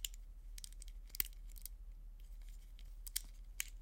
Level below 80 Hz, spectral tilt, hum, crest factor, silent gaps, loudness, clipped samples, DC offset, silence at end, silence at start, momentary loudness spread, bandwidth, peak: -52 dBFS; 0 dB/octave; none; 36 dB; none; -48 LUFS; under 0.1%; under 0.1%; 0 s; 0 s; 17 LU; 17 kHz; -12 dBFS